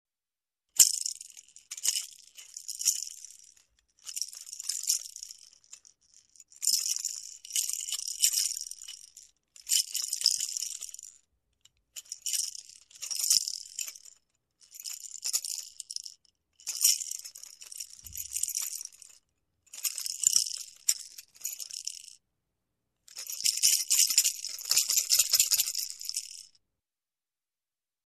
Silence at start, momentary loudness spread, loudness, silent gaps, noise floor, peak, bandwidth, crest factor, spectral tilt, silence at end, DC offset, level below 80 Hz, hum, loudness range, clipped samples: 0.75 s; 22 LU; -28 LUFS; none; under -90 dBFS; -4 dBFS; 14 kHz; 30 dB; 5 dB/octave; 1.65 s; under 0.1%; -74 dBFS; none; 9 LU; under 0.1%